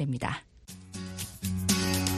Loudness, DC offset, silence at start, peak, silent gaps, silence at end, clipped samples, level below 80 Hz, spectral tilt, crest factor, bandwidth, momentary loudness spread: -31 LUFS; under 0.1%; 0 s; -10 dBFS; none; 0 s; under 0.1%; -52 dBFS; -4 dB/octave; 20 dB; 14 kHz; 19 LU